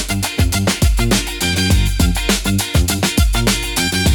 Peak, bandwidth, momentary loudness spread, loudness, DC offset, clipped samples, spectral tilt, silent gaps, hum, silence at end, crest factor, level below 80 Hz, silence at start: -2 dBFS; 19 kHz; 2 LU; -16 LUFS; under 0.1%; under 0.1%; -4 dB/octave; none; none; 0 s; 12 dB; -20 dBFS; 0 s